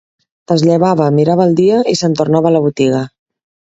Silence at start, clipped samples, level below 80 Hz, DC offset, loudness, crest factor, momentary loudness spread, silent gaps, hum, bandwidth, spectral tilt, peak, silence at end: 0.5 s; under 0.1%; -52 dBFS; under 0.1%; -12 LUFS; 12 dB; 5 LU; none; none; 8 kHz; -7 dB/octave; 0 dBFS; 0.7 s